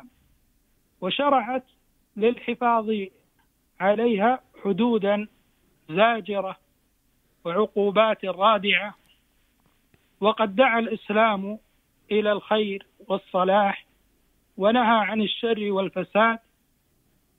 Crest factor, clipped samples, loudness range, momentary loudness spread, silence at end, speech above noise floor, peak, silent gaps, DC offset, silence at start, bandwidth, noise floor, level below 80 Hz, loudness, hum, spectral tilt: 20 dB; under 0.1%; 3 LU; 12 LU; 1 s; 44 dB; -4 dBFS; none; under 0.1%; 1 s; 4.1 kHz; -67 dBFS; -66 dBFS; -23 LUFS; none; -7.5 dB/octave